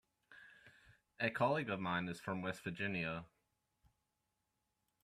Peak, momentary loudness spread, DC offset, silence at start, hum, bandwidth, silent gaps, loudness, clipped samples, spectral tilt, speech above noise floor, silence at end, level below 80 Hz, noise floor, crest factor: -22 dBFS; 23 LU; under 0.1%; 0.3 s; none; 14.5 kHz; none; -40 LUFS; under 0.1%; -6 dB/octave; 47 dB; 1.75 s; -76 dBFS; -87 dBFS; 20 dB